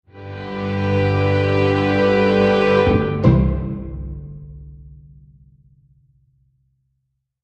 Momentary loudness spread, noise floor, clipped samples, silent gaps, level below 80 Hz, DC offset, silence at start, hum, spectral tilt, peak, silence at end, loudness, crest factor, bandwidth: 19 LU; -73 dBFS; under 0.1%; none; -34 dBFS; under 0.1%; 0.15 s; none; -8.5 dB/octave; -2 dBFS; 2.5 s; -17 LUFS; 18 dB; 7.8 kHz